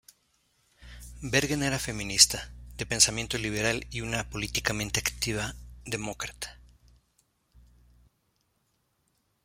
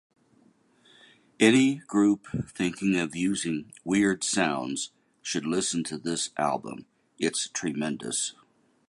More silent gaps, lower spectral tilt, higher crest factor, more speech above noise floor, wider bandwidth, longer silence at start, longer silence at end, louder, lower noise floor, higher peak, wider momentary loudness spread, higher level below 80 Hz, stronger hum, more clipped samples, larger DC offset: neither; second, -2 dB/octave vs -4 dB/octave; first, 28 dB vs 22 dB; first, 45 dB vs 36 dB; first, 16.5 kHz vs 11.5 kHz; second, 0.8 s vs 1.4 s; first, 2.85 s vs 0.55 s; about the same, -27 LUFS vs -27 LUFS; first, -74 dBFS vs -63 dBFS; about the same, -4 dBFS vs -6 dBFS; first, 20 LU vs 11 LU; first, -48 dBFS vs -62 dBFS; neither; neither; neither